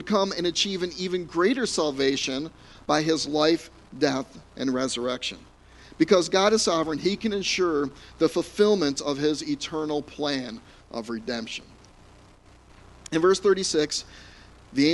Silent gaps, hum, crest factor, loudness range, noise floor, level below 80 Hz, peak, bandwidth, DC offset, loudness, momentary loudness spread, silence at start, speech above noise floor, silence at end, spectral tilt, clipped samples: none; none; 20 dB; 6 LU; -53 dBFS; -56 dBFS; -6 dBFS; 11.5 kHz; under 0.1%; -25 LUFS; 13 LU; 0 s; 28 dB; 0 s; -3.5 dB/octave; under 0.1%